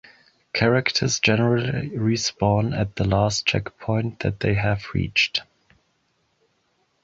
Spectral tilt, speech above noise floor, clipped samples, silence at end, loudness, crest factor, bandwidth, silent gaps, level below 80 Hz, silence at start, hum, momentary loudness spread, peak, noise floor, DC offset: -4.5 dB/octave; 47 dB; under 0.1%; 1.6 s; -22 LUFS; 20 dB; 7.8 kHz; none; -44 dBFS; 0.55 s; none; 7 LU; -2 dBFS; -69 dBFS; under 0.1%